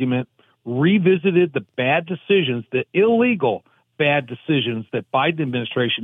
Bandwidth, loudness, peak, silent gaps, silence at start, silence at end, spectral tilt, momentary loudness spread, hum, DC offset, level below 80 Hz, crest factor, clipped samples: 3.9 kHz; -20 LUFS; -4 dBFS; none; 0 s; 0 s; -9 dB/octave; 8 LU; none; under 0.1%; -72 dBFS; 14 dB; under 0.1%